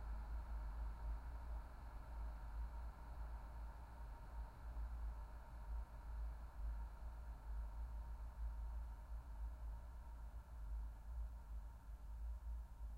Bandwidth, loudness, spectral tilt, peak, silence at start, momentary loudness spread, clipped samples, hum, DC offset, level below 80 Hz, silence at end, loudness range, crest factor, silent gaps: 5.4 kHz; -54 LUFS; -7 dB/octave; -38 dBFS; 0 s; 6 LU; under 0.1%; none; under 0.1%; -50 dBFS; 0 s; 2 LU; 12 dB; none